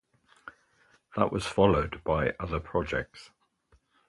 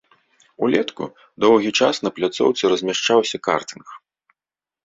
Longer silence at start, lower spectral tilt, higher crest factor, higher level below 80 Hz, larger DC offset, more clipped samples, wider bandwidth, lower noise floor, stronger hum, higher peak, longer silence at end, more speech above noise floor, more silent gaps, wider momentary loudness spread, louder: second, 0.45 s vs 0.6 s; first, -6.5 dB/octave vs -3.5 dB/octave; first, 24 dB vs 18 dB; first, -46 dBFS vs -64 dBFS; neither; neither; first, 11.5 kHz vs 8 kHz; second, -67 dBFS vs under -90 dBFS; neither; second, -6 dBFS vs -2 dBFS; about the same, 0.8 s vs 0.85 s; second, 39 dB vs over 71 dB; neither; first, 26 LU vs 15 LU; second, -29 LUFS vs -19 LUFS